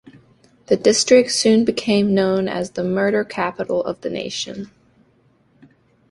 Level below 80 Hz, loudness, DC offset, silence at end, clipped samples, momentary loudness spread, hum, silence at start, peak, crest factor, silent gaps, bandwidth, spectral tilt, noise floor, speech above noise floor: -58 dBFS; -18 LUFS; under 0.1%; 1.45 s; under 0.1%; 12 LU; none; 0.7 s; -2 dBFS; 18 dB; none; 11.5 kHz; -4 dB/octave; -58 dBFS; 40 dB